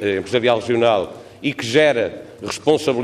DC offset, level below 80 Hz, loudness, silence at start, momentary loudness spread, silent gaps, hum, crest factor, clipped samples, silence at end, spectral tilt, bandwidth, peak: under 0.1%; -60 dBFS; -18 LUFS; 0 s; 11 LU; none; none; 16 dB; under 0.1%; 0 s; -4.5 dB/octave; 13.5 kHz; -2 dBFS